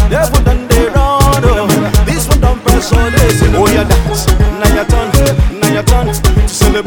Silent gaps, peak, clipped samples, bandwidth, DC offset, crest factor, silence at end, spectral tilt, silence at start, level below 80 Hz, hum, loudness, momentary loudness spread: none; 0 dBFS; 0.1%; 18 kHz; under 0.1%; 8 dB; 0 s; -5 dB/octave; 0 s; -12 dBFS; none; -10 LUFS; 3 LU